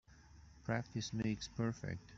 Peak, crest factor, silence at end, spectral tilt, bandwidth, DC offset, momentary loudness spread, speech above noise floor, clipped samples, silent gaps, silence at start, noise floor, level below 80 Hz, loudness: -22 dBFS; 20 dB; 0 s; -5.5 dB/octave; 7.8 kHz; under 0.1%; 15 LU; 20 dB; under 0.1%; none; 0.1 s; -61 dBFS; -64 dBFS; -42 LUFS